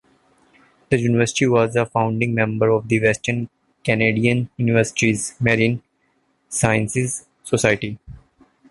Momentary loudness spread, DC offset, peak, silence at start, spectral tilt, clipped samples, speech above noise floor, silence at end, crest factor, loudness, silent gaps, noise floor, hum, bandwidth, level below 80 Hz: 10 LU; under 0.1%; -2 dBFS; 0.9 s; -5.5 dB/octave; under 0.1%; 46 dB; 0.55 s; 18 dB; -19 LUFS; none; -65 dBFS; none; 11.5 kHz; -50 dBFS